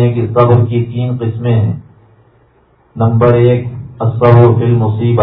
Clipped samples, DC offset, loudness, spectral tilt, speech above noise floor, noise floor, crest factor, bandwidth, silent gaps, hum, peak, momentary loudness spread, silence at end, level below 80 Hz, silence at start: 0.5%; under 0.1%; -11 LUFS; -12 dB/octave; 40 dB; -50 dBFS; 12 dB; 4 kHz; none; none; 0 dBFS; 10 LU; 0 s; -42 dBFS; 0 s